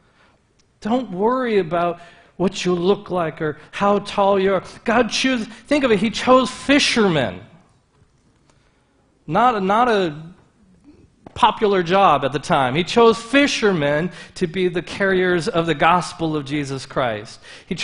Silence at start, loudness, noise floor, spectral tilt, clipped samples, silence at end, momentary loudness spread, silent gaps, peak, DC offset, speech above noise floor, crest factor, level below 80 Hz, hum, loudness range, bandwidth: 0.8 s; -19 LUFS; -59 dBFS; -5 dB/octave; under 0.1%; 0 s; 10 LU; none; 0 dBFS; under 0.1%; 41 dB; 18 dB; -50 dBFS; none; 5 LU; 10.5 kHz